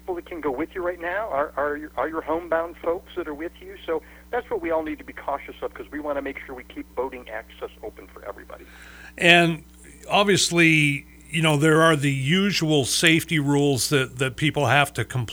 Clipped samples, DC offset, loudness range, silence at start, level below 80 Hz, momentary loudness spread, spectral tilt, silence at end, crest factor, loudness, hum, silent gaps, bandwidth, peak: under 0.1%; under 0.1%; 13 LU; 0.05 s; -50 dBFS; 20 LU; -4 dB/octave; 0 s; 24 dB; -22 LUFS; none; none; over 20 kHz; 0 dBFS